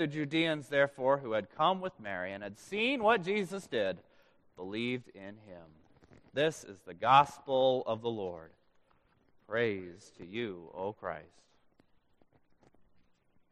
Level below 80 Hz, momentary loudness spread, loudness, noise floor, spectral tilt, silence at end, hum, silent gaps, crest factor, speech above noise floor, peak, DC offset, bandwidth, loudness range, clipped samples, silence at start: -74 dBFS; 19 LU; -32 LUFS; -69 dBFS; -5 dB/octave; 2.3 s; none; none; 24 dB; 37 dB; -10 dBFS; under 0.1%; 13 kHz; 8 LU; under 0.1%; 0 s